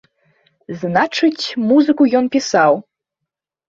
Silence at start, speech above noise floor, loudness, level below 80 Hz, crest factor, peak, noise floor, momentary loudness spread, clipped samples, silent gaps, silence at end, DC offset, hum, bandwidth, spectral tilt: 0.7 s; 66 dB; -15 LUFS; -62 dBFS; 16 dB; 0 dBFS; -81 dBFS; 8 LU; under 0.1%; none; 0.9 s; under 0.1%; none; 7.6 kHz; -5 dB/octave